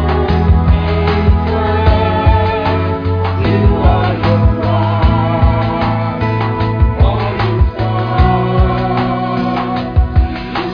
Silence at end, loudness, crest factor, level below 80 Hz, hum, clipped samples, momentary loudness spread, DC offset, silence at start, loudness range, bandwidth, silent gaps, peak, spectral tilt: 0 s; -13 LUFS; 12 dB; -18 dBFS; none; under 0.1%; 4 LU; 0.3%; 0 s; 1 LU; 5.2 kHz; none; 0 dBFS; -9.5 dB/octave